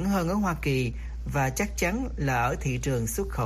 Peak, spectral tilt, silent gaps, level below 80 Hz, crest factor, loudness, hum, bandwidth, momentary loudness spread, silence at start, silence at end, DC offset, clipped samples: -14 dBFS; -5.5 dB/octave; none; -36 dBFS; 14 dB; -28 LUFS; none; 15.5 kHz; 4 LU; 0 s; 0 s; under 0.1%; under 0.1%